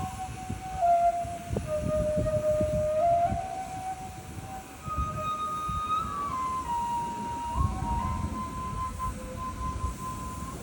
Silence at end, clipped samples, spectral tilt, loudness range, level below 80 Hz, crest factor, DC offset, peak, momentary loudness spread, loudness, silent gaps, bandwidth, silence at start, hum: 0 s; under 0.1%; -6 dB/octave; 5 LU; -40 dBFS; 16 dB; under 0.1%; -14 dBFS; 12 LU; -31 LUFS; none; over 20 kHz; 0 s; none